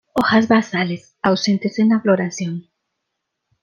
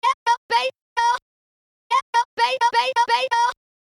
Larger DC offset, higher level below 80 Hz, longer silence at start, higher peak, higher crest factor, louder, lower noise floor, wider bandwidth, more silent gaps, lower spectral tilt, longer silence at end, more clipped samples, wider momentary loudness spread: neither; first, -58 dBFS vs -66 dBFS; about the same, 0.15 s vs 0.05 s; first, -2 dBFS vs -8 dBFS; about the same, 16 dB vs 14 dB; first, -18 LUFS vs -21 LUFS; second, -77 dBFS vs under -90 dBFS; second, 7.6 kHz vs 12 kHz; second, none vs 0.14-0.26 s, 0.38-0.49 s, 0.82-0.96 s, 1.22-1.90 s, 2.02-2.13 s, 2.25-2.37 s; first, -5.5 dB/octave vs 1 dB/octave; first, 1 s vs 0.25 s; neither; first, 11 LU vs 5 LU